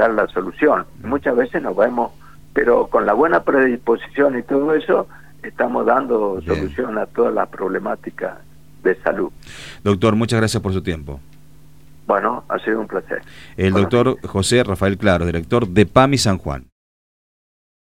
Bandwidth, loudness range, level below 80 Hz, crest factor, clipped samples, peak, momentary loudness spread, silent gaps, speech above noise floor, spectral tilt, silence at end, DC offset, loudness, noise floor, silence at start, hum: 16 kHz; 5 LU; -44 dBFS; 18 dB; under 0.1%; 0 dBFS; 13 LU; none; 29 dB; -6 dB/octave; 1.35 s; 0.8%; -18 LUFS; -47 dBFS; 0 s; none